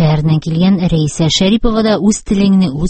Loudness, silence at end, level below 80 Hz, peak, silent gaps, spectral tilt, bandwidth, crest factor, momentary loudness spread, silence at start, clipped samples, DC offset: -12 LUFS; 0 s; -28 dBFS; 0 dBFS; none; -6 dB/octave; 8.8 kHz; 12 dB; 3 LU; 0 s; under 0.1%; under 0.1%